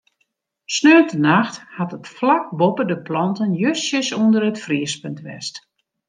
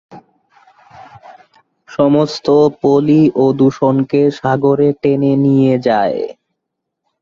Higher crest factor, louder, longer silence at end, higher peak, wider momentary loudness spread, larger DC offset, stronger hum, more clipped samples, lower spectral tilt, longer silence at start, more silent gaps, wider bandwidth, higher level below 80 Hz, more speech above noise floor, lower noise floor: first, 18 dB vs 12 dB; second, -18 LUFS vs -13 LUFS; second, 0.5 s vs 0.9 s; about the same, -2 dBFS vs -2 dBFS; first, 16 LU vs 4 LU; neither; neither; neither; second, -5 dB/octave vs -8 dB/octave; first, 0.7 s vs 0.1 s; neither; first, 9.8 kHz vs 7.4 kHz; second, -68 dBFS vs -54 dBFS; second, 52 dB vs 64 dB; second, -70 dBFS vs -76 dBFS